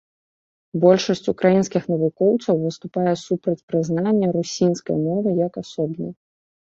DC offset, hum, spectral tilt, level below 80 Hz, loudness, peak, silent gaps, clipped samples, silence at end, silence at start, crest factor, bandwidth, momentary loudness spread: under 0.1%; none; -6.5 dB/octave; -62 dBFS; -21 LUFS; -2 dBFS; 3.63-3.68 s; under 0.1%; 0.65 s; 0.75 s; 18 dB; 7.8 kHz; 9 LU